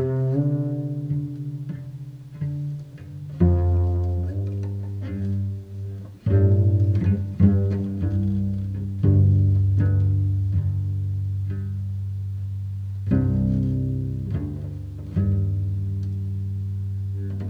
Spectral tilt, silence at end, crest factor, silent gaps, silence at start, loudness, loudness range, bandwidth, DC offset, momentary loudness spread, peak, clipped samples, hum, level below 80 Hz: -11 dB/octave; 0 s; 18 dB; none; 0 s; -24 LUFS; 6 LU; 2.6 kHz; under 0.1%; 13 LU; -4 dBFS; under 0.1%; none; -38 dBFS